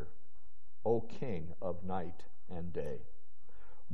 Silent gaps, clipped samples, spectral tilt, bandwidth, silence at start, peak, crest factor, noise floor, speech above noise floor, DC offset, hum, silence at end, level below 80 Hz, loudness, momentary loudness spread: none; under 0.1%; -8 dB/octave; 6.4 kHz; 0 s; -18 dBFS; 20 dB; -69 dBFS; 27 dB; 3%; none; 0 s; -62 dBFS; -41 LUFS; 14 LU